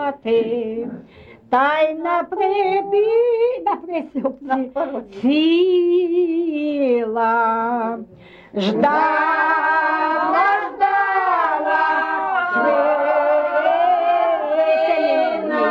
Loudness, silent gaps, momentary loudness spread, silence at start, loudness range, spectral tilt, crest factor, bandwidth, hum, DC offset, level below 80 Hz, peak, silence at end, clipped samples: -18 LUFS; none; 7 LU; 0 s; 2 LU; -6.5 dB/octave; 12 dB; 6.8 kHz; none; under 0.1%; -62 dBFS; -6 dBFS; 0 s; under 0.1%